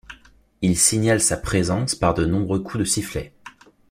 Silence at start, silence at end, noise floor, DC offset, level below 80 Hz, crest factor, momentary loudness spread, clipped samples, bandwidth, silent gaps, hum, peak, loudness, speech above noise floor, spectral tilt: 0.1 s; 0.4 s; -52 dBFS; under 0.1%; -42 dBFS; 20 dB; 9 LU; under 0.1%; 16 kHz; none; none; -2 dBFS; -20 LUFS; 31 dB; -4 dB/octave